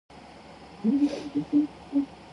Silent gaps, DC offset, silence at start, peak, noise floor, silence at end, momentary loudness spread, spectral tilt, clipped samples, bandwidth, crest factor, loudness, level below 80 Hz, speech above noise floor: none; under 0.1%; 0.1 s; -14 dBFS; -47 dBFS; 0 s; 22 LU; -7 dB/octave; under 0.1%; 10.5 kHz; 14 dB; -28 LUFS; -60 dBFS; 21 dB